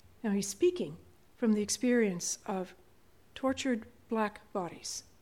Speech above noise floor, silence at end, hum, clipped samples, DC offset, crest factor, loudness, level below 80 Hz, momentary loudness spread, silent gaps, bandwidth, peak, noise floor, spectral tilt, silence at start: 32 dB; 0.2 s; none; under 0.1%; under 0.1%; 16 dB; -33 LUFS; -68 dBFS; 11 LU; none; 16.5 kHz; -18 dBFS; -64 dBFS; -4 dB/octave; 0.25 s